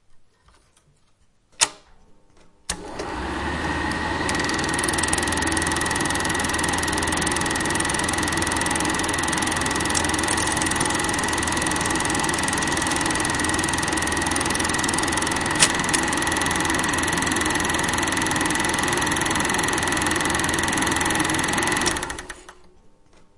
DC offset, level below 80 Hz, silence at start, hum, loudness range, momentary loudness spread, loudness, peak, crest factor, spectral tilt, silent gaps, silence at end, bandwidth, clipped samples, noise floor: under 0.1%; -42 dBFS; 0.1 s; none; 5 LU; 4 LU; -21 LUFS; 0 dBFS; 24 dB; -2.5 dB/octave; none; 0.5 s; 11.5 kHz; under 0.1%; -59 dBFS